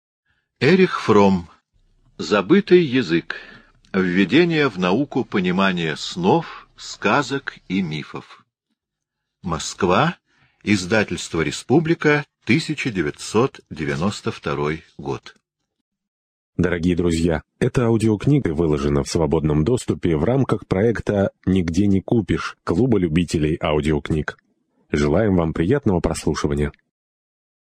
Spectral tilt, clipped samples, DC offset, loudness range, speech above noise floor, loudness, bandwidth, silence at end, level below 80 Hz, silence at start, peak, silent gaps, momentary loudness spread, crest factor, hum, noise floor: -6 dB/octave; under 0.1%; under 0.1%; 6 LU; 63 dB; -20 LUFS; 10.5 kHz; 1 s; -40 dBFS; 0.6 s; -2 dBFS; 15.81-15.92 s, 16.08-16.53 s; 11 LU; 18 dB; none; -82 dBFS